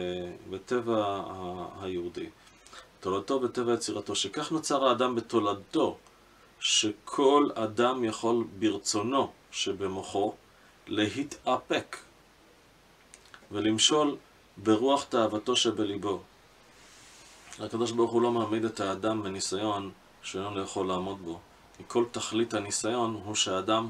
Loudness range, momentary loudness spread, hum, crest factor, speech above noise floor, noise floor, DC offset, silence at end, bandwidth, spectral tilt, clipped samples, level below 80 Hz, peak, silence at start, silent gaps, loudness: 6 LU; 14 LU; none; 22 dB; 30 dB; -59 dBFS; under 0.1%; 0 s; 13.5 kHz; -3.5 dB/octave; under 0.1%; -68 dBFS; -8 dBFS; 0 s; none; -29 LUFS